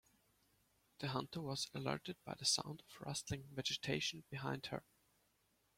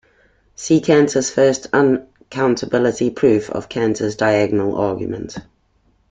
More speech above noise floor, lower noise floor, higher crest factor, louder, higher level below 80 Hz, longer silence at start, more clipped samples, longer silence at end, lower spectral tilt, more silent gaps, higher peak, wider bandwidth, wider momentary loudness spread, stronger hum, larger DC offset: second, 36 dB vs 43 dB; first, -79 dBFS vs -60 dBFS; first, 24 dB vs 16 dB; second, -43 LUFS vs -17 LUFS; second, -72 dBFS vs -52 dBFS; first, 1 s vs 0.6 s; neither; first, 0.95 s vs 0.7 s; second, -3 dB/octave vs -5.5 dB/octave; neither; second, -22 dBFS vs -2 dBFS; first, 16.5 kHz vs 9.4 kHz; about the same, 12 LU vs 12 LU; neither; neither